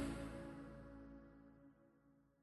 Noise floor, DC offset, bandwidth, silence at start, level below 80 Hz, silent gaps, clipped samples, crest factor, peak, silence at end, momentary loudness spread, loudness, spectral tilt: -73 dBFS; under 0.1%; 12 kHz; 0 s; -62 dBFS; none; under 0.1%; 20 dB; -34 dBFS; 0.15 s; 17 LU; -54 LUFS; -6 dB/octave